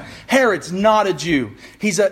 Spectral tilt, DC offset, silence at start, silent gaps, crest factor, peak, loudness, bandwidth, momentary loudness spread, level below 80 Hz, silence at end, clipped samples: -4 dB/octave; under 0.1%; 0 s; none; 18 dB; 0 dBFS; -17 LUFS; 16 kHz; 7 LU; -50 dBFS; 0 s; under 0.1%